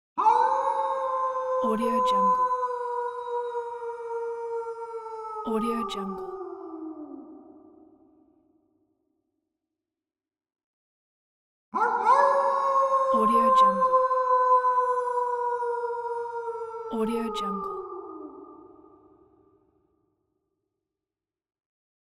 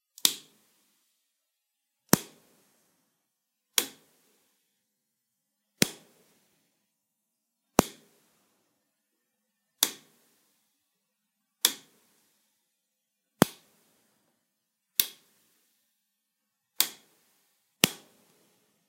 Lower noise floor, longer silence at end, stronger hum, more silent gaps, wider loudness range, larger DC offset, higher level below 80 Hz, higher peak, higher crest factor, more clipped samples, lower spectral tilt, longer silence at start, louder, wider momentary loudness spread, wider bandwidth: first, under -90 dBFS vs -82 dBFS; first, 3.4 s vs 0.95 s; neither; first, 10.64-11.72 s vs none; first, 17 LU vs 4 LU; neither; about the same, -66 dBFS vs -62 dBFS; second, -8 dBFS vs 0 dBFS; second, 20 dB vs 36 dB; neither; first, -5.5 dB/octave vs -2.5 dB/octave; about the same, 0.15 s vs 0.25 s; first, -25 LUFS vs -28 LUFS; about the same, 17 LU vs 16 LU; second, 12.5 kHz vs 16 kHz